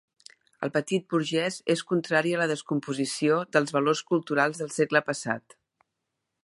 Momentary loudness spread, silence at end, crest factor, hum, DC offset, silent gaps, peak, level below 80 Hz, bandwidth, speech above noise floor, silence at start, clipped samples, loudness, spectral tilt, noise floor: 6 LU; 1.05 s; 20 dB; none; under 0.1%; none; -8 dBFS; -76 dBFS; 11.5 kHz; 56 dB; 0.6 s; under 0.1%; -27 LUFS; -4.5 dB/octave; -83 dBFS